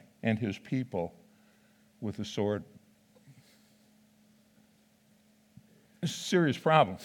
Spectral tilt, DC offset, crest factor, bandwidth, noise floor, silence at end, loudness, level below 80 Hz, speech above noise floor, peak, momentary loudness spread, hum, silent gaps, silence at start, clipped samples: -5.5 dB/octave; under 0.1%; 26 dB; 17.5 kHz; -65 dBFS; 0 s; -31 LUFS; -76 dBFS; 36 dB; -8 dBFS; 14 LU; none; none; 0.25 s; under 0.1%